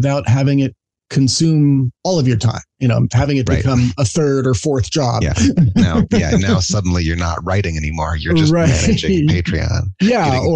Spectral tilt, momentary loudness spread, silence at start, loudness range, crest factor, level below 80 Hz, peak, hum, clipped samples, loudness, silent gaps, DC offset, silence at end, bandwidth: -6 dB/octave; 5 LU; 0 s; 1 LU; 12 dB; -30 dBFS; -2 dBFS; none; under 0.1%; -15 LUFS; none; under 0.1%; 0 s; 9.6 kHz